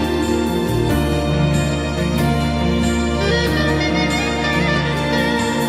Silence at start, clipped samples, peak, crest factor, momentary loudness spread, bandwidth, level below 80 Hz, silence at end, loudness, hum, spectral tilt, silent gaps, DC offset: 0 s; under 0.1%; -4 dBFS; 12 dB; 2 LU; 16 kHz; -28 dBFS; 0 s; -18 LUFS; none; -5.5 dB/octave; none; under 0.1%